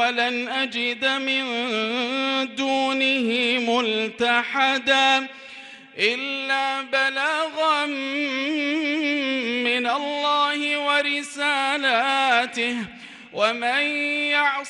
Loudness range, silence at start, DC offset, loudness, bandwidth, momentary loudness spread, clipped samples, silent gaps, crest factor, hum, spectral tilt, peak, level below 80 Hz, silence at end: 2 LU; 0 s; under 0.1%; -21 LUFS; 11.5 kHz; 5 LU; under 0.1%; none; 18 dB; none; -2 dB/octave; -6 dBFS; -72 dBFS; 0 s